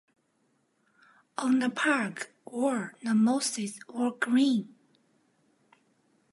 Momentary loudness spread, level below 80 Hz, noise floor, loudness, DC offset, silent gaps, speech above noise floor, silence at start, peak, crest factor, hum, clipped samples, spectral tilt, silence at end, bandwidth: 12 LU; -86 dBFS; -72 dBFS; -28 LUFS; under 0.1%; none; 45 dB; 1.4 s; -10 dBFS; 20 dB; none; under 0.1%; -4 dB/octave; 1.65 s; 11.5 kHz